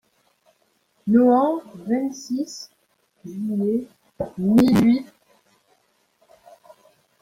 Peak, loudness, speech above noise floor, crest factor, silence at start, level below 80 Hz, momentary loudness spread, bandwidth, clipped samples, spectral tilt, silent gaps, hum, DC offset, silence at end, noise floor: -6 dBFS; -21 LUFS; 46 dB; 18 dB; 1.05 s; -58 dBFS; 21 LU; 15.5 kHz; under 0.1%; -7 dB/octave; none; none; under 0.1%; 2.2 s; -66 dBFS